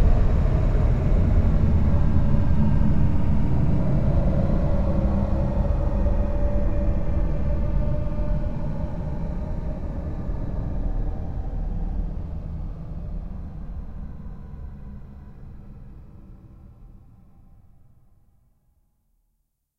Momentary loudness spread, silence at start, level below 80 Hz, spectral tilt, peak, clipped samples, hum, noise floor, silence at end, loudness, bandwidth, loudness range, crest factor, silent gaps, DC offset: 18 LU; 0 s; -26 dBFS; -10 dB/octave; -6 dBFS; under 0.1%; none; -73 dBFS; 0 s; -25 LUFS; 5.2 kHz; 18 LU; 16 dB; none; under 0.1%